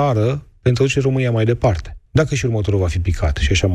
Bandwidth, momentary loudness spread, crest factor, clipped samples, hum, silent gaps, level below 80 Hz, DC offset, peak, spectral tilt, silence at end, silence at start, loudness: 10.5 kHz; 4 LU; 14 dB; under 0.1%; none; none; -28 dBFS; under 0.1%; -4 dBFS; -6 dB/octave; 0 s; 0 s; -18 LUFS